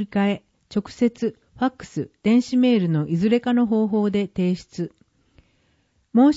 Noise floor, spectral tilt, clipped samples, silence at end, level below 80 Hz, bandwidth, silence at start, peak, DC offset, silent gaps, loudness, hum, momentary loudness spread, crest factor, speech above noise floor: -65 dBFS; -7.5 dB/octave; under 0.1%; 0 s; -58 dBFS; 8 kHz; 0 s; -6 dBFS; under 0.1%; none; -22 LUFS; none; 13 LU; 16 dB; 44 dB